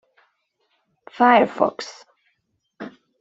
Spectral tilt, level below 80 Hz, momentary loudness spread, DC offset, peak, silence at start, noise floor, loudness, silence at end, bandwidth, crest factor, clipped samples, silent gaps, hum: -5 dB/octave; -70 dBFS; 24 LU; under 0.1%; -2 dBFS; 1.2 s; -72 dBFS; -18 LUFS; 0.35 s; 7.8 kHz; 22 dB; under 0.1%; none; none